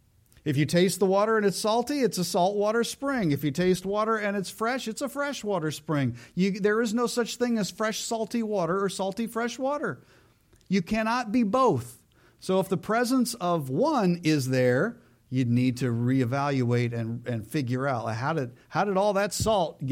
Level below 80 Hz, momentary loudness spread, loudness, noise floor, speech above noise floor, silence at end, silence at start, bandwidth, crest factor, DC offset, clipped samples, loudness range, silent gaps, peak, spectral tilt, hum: -58 dBFS; 7 LU; -27 LUFS; -60 dBFS; 34 dB; 0 s; 0.45 s; 16.5 kHz; 16 dB; under 0.1%; under 0.1%; 3 LU; none; -12 dBFS; -5.5 dB/octave; none